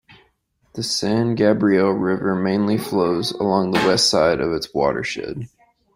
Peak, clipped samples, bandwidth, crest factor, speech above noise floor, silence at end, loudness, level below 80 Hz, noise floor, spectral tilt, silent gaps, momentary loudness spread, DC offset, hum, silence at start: -4 dBFS; under 0.1%; 16 kHz; 16 dB; 45 dB; 0.5 s; -19 LUFS; -52 dBFS; -63 dBFS; -4.5 dB/octave; none; 13 LU; under 0.1%; none; 0.1 s